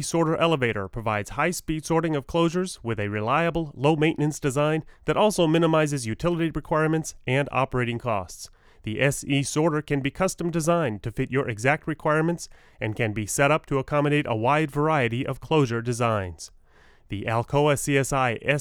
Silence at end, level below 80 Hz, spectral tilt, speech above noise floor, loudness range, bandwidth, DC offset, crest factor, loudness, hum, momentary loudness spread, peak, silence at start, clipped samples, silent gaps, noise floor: 0 s; -48 dBFS; -5.5 dB/octave; 30 dB; 3 LU; 16.5 kHz; under 0.1%; 18 dB; -24 LUFS; none; 8 LU; -6 dBFS; 0 s; under 0.1%; none; -54 dBFS